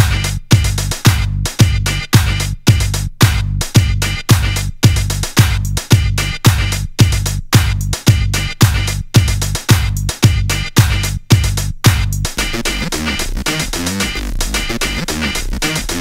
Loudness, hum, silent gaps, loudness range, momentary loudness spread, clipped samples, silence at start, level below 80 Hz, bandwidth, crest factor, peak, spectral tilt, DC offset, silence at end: -15 LUFS; none; none; 3 LU; 5 LU; 0.2%; 0 s; -22 dBFS; 16.5 kHz; 14 dB; 0 dBFS; -4 dB/octave; 0.8%; 0 s